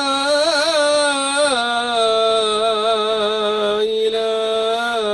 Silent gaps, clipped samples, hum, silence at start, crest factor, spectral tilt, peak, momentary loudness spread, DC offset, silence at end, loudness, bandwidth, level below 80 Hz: none; under 0.1%; none; 0 s; 12 dB; -1 dB/octave; -4 dBFS; 3 LU; under 0.1%; 0 s; -17 LUFS; 12.5 kHz; -56 dBFS